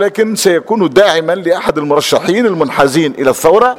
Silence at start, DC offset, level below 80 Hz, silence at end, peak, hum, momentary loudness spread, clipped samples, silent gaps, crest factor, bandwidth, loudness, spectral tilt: 0 s; under 0.1%; -46 dBFS; 0 s; 0 dBFS; none; 4 LU; 0.3%; none; 10 dB; 17 kHz; -11 LUFS; -4 dB/octave